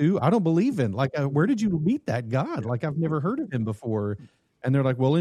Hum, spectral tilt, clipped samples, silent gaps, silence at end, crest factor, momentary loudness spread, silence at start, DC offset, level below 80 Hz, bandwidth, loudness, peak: none; -8.5 dB/octave; under 0.1%; none; 0 s; 16 dB; 7 LU; 0 s; under 0.1%; -60 dBFS; 11 kHz; -25 LUFS; -8 dBFS